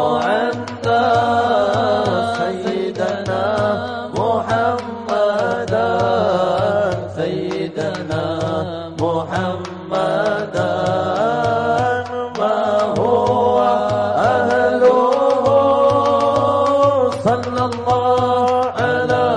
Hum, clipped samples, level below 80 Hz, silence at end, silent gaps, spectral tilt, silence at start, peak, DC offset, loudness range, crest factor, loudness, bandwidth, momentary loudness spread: none; under 0.1%; -50 dBFS; 0 s; none; -6 dB/octave; 0 s; -4 dBFS; under 0.1%; 6 LU; 12 dB; -17 LUFS; 11 kHz; 8 LU